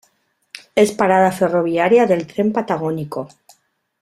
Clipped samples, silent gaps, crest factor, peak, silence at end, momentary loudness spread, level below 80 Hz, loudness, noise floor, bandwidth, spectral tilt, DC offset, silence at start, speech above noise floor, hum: under 0.1%; none; 16 dB; -2 dBFS; 0.75 s; 15 LU; -60 dBFS; -17 LUFS; -64 dBFS; 14.5 kHz; -6 dB/octave; under 0.1%; 0.75 s; 48 dB; none